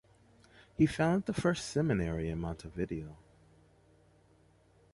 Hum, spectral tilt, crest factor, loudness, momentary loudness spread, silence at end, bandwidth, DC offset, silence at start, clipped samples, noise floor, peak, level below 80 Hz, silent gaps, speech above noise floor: none; -6.5 dB/octave; 20 dB; -33 LUFS; 12 LU; 1.8 s; 11.5 kHz; under 0.1%; 0.8 s; under 0.1%; -65 dBFS; -16 dBFS; -52 dBFS; none; 33 dB